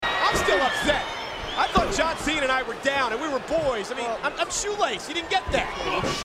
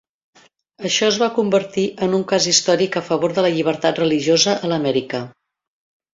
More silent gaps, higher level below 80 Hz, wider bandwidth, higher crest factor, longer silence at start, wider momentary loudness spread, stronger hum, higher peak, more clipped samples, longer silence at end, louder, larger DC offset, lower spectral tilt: neither; first, -42 dBFS vs -62 dBFS; first, 16 kHz vs 8 kHz; about the same, 18 dB vs 18 dB; second, 0 s vs 0.8 s; about the same, 6 LU vs 8 LU; neither; second, -6 dBFS vs -2 dBFS; neither; second, 0 s vs 0.85 s; second, -24 LUFS vs -18 LUFS; neither; about the same, -3 dB/octave vs -3.5 dB/octave